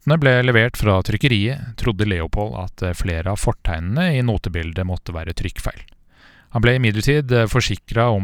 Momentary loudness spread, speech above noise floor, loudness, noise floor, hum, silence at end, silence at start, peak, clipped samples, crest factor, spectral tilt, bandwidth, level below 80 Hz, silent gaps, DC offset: 11 LU; 31 dB; -19 LUFS; -50 dBFS; none; 0 s; 0.05 s; 0 dBFS; under 0.1%; 18 dB; -6 dB/octave; 16.5 kHz; -32 dBFS; none; under 0.1%